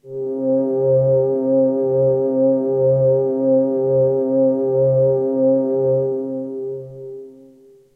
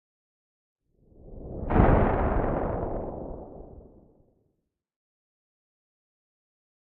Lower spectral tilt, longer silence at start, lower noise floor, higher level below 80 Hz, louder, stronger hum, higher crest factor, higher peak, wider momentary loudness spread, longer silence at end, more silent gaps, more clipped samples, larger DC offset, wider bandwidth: first, -13.5 dB/octave vs -8.5 dB/octave; second, 0.05 s vs 1.25 s; second, -48 dBFS vs -79 dBFS; second, -58 dBFS vs -36 dBFS; first, -17 LUFS vs -26 LUFS; neither; second, 10 dB vs 24 dB; about the same, -8 dBFS vs -6 dBFS; second, 11 LU vs 24 LU; second, 0.65 s vs 3.2 s; neither; neither; neither; second, 1.7 kHz vs 3.9 kHz